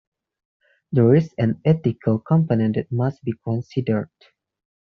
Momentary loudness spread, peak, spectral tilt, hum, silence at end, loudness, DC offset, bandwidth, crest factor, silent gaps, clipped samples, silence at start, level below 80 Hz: 9 LU; -4 dBFS; -9.5 dB/octave; none; 0.85 s; -21 LUFS; under 0.1%; 6.2 kHz; 18 dB; none; under 0.1%; 0.9 s; -60 dBFS